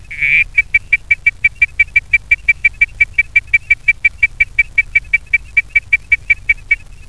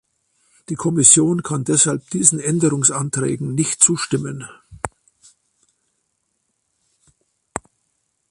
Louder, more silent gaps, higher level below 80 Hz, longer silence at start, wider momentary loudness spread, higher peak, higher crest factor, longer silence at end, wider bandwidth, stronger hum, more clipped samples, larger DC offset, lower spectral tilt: first, -12 LUFS vs -16 LUFS; neither; first, -34 dBFS vs -54 dBFS; second, 0.1 s vs 0.7 s; second, 2 LU vs 21 LU; about the same, 0 dBFS vs 0 dBFS; second, 14 dB vs 20 dB; second, 0.3 s vs 0.7 s; about the same, 11 kHz vs 12 kHz; neither; neither; first, 1% vs under 0.1%; second, -2 dB/octave vs -4 dB/octave